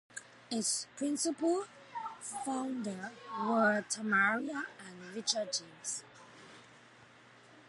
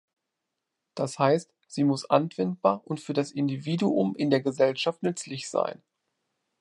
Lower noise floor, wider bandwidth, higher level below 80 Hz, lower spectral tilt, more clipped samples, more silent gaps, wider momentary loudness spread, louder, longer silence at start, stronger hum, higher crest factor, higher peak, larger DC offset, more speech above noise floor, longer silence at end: second, -59 dBFS vs -84 dBFS; about the same, 11.5 kHz vs 11.5 kHz; second, -86 dBFS vs -76 dBFS; second, -2.5 dB/octave vs -6 dB/octave; neither; neither; first, 20 LU vs 8 LU; second, -35 LUFS vs -27 LUFS; second, 0.15 s vs 0.95 s; neither; about the same, 22 dB vs 22 dB; second, -14 dBFS vs -6 dBFS; neither; second, 25 dB vs 58 dB; second, 0.05 s vs 0.85 s